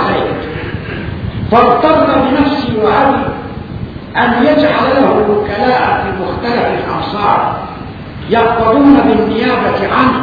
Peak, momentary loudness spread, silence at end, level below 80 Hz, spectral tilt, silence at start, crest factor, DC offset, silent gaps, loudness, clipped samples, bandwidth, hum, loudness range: 0 dBFS; 13 LU; 0 s; -34 dBFS; -8.5 dB/octave; 0 s; 12 dB; under 0.1%; none; -11 LUFS; 0.3%; 5.4 kHz; none; 2 LU